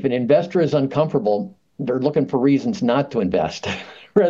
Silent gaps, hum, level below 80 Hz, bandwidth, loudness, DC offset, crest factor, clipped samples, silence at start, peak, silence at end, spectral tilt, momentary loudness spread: none; none; -58 dBFS; 7.4 kHz; -20 LUFS; under 0.1%; 16 dB; under 0.1%; 0 s; -2 dBFS; 0 s; -7 dB/octave; 10 LU